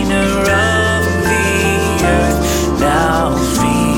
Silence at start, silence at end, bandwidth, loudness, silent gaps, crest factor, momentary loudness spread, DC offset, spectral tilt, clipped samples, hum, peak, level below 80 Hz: 0 s; 0 s; 17 kHz; -13 LUFS; none; 12 dB; 2 LU; under 0.1%; -4.5 dB/octave; under 0.1%; none; -2 dBFS; -24 dBFS